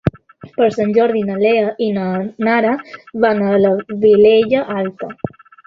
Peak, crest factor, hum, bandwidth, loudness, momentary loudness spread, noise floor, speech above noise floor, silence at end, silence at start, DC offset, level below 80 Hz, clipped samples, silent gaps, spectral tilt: 0 dBFS; 14 dB; none; 7 kHz; -15 LUFS; 16 LU; -37 dBFS; 23 dB; 0.4 s; 0.05 s; under 0.1%; -48 dBFS; under 0.1%; none; -8 dB/octave